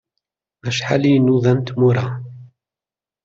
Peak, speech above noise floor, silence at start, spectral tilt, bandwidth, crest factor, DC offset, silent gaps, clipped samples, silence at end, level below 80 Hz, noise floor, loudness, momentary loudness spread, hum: -4 dBFS; over 74 dB; 0.65 s; -7 dB/octave; 7.6 kHz; 16 dB; under 0.1%; none; under 0.1%; 0.8 s; -56 dBFS; under -90 dBFS; -17 LUFS; 16 LU; none